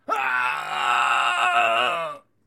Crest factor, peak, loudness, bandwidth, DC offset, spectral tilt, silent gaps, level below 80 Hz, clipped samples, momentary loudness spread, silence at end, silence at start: 16 dB; -6 dBFS; -21 LUFS; 16.5 kHz; under 0.1%; -1 dB/octave; none; -78 dBFS; under 0.1%; 5 LU; 0.3 s; 0.1 s